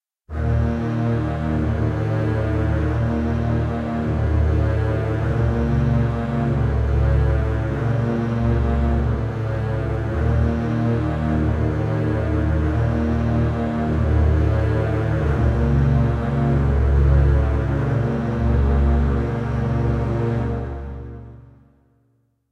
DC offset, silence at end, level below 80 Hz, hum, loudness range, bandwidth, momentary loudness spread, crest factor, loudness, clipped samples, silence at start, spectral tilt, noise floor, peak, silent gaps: under 0.1%; 1.05 s; -24 dBFS; none; 3 LU; 6.4 kHz; 5 LU; 14 dB; -21 LUFS; under 0.1%; 0.3 s; -9.5 dB/octave; -64 dBFS; -4 dBFS; none